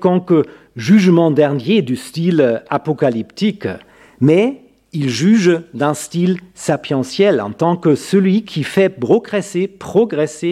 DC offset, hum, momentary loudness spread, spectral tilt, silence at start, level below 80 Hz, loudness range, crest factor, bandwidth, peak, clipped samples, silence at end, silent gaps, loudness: under 0.1%; none; 9 LU; -6.5 dB/octave; 0 s; -60 dBFS; 2 LU; 14 dB; 14 kHz; 0 dBFS; under 0.1%; 0 s; none; -15 LUFS